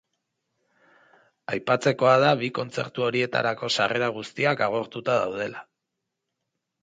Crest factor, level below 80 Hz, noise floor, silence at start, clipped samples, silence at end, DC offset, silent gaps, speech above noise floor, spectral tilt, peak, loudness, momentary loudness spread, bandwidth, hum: 20 dB; -70 dBFS; -82 dBFS; 1.5 s; under 0.1%; 1.2 s; under 0.1%; none; 58 dB; -5 dB/octave; -6 dBFS; -24 LUFS; 12 LU; 9.4 kHz; none